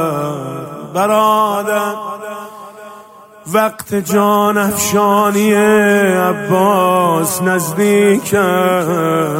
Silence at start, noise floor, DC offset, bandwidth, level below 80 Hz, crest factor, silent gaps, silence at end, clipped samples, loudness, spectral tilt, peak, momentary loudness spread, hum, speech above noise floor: 0 s; -38 dBFS; under 0.1%; 16.5 kHz; -56 dBFS; 14 dB; none; 0 s; under 0.1%; -13 LUFS; -5 dB/octave; 0 dBFS; 14 LU; none; 26 dB